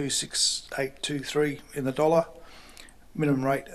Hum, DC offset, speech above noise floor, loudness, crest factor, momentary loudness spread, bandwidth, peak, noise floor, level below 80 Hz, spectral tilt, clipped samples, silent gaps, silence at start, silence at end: none; under 0.1%; 22 dB; -27 LUFS; 20 dB; 10 LU; 14 kHz; -8 dBFS; -49 dBFS; -58 dBFS; -3.5 dB/octave; under 0.1%; none; 0 s; 0 s